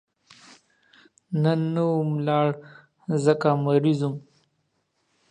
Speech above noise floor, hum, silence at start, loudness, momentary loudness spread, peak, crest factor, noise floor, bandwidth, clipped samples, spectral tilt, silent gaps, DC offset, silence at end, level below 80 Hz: 50 dB; none; 1.3 s; -23 LUFS; 10 LU; -4 dBFS; 20 dB; -73 dBFS; 9.8 kHz; under 0.1%; -8 dB/octave; none; under 0.1%; 1.1 s; -72 dBFS